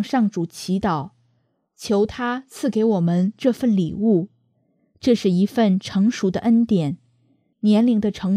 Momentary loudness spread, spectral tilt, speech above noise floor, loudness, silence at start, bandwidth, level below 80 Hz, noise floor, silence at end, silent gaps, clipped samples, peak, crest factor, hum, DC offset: 9 LU; -7 dB/octave; 48 dB; -20 LUFS; 0 s; 13.5 kHz; -54 dBFS; -67 dBFS; 0 s; none; under 0.1%; -6 dBFS; 16 dB; none; under 0.1%